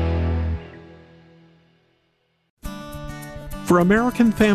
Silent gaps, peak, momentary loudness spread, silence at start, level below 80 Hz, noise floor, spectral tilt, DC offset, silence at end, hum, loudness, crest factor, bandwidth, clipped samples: 2.50-2.57 s; -6 dBFS; 21 LU; 0 s; -38 dBFS; -68 dBFS; -7 dB/octave; under 0.1%; 0 s; none; -20 LUFS; 18 dB; 14 kHz; under 0.1%